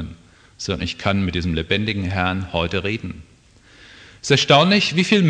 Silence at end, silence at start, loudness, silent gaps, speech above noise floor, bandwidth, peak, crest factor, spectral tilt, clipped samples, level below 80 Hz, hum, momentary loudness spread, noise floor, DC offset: 0 s; 0 s; -19 LUFS; none; 31 dB; 9.8 kHz; -2 dBFS; 20 dB; -5 dB/octave; under 0.1%; -42 dBFS; none; 18 LU; -50 dBFS; under 0.1%